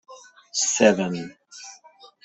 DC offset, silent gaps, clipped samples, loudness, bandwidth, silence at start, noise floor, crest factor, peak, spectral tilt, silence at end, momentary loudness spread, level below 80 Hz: under 0.1%; none; under 0.1%; -21 LUFS; 8.4 kHz; 0.1 s; -51 dBFS; 22 dB; -4 dBFS; -3 dB/octave; 0.2 s; 23 LU; -66 dBFS